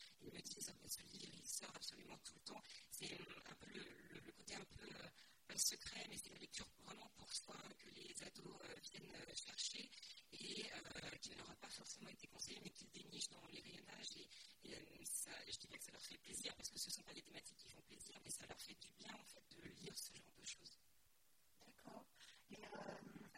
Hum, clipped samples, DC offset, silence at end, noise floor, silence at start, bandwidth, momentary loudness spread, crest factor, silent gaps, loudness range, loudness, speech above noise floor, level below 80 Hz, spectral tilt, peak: none; under 0.1%; under 0.1%; 0 s; -79 dBFS; 0 s; 16 kHz; 12 LU; 28 dB; none; 7 LU; -53 LUFS; 22 dB; -80 dBFS; -1 dB/octave; -28 dBFS